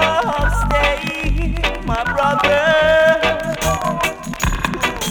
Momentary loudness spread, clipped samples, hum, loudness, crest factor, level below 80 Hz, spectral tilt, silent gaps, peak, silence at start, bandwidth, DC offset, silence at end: 8 LU; under 0.1%; none; -17 LUFS; 14 dB; -24 dBFS; -4 dB/octave; none; -2 dBFS; 0 s; 19 kHz; under 0.1%; 0 s